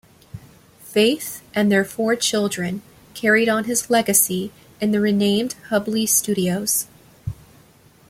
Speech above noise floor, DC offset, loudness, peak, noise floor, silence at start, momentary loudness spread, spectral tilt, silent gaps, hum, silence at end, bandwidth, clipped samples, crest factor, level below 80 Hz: 32 dB; under 0.1%; -19 LUFS; 0 dBFS; -52 dBFS; 0.35 s; 17 LU; -3.5 dB/octave; none; none; 0.75 s; 16.5 kHz; under 0.1%; 20 dB; -54 dBFS